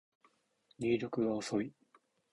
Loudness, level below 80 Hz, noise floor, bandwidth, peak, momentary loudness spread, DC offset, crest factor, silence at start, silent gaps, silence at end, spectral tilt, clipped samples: -36 LUFS; -72 dBFS; -74 dBFS; 11 kHz; -20 dBFS; 6 LU; under 0.1%; 18 dB; 0.8 s; none; 0.6 s; -6 dB/octave; under 0.1%